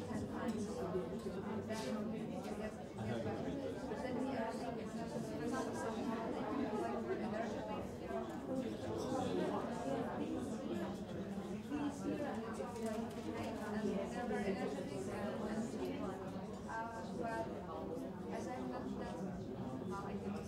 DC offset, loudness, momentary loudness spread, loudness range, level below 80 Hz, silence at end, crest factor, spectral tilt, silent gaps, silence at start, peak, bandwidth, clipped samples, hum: under 0.1%; -43 LUFS; 5 LU; 3 LU; -64 dBFS; 0 s; 14 dB; -6.5 dB/octave; none; 0 s; -28 dBFS; 16 kHz; under 0.1%; none